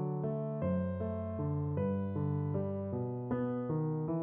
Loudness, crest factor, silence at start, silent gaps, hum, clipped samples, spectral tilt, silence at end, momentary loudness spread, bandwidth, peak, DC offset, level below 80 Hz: -36 LUFS; 12 dB; 0 s; none; none; under 0.1%; -11 dB/octave; 0 s; 3 LU; 3.4 kHz; -24 dBFS; under 0.1%; -62 dBFS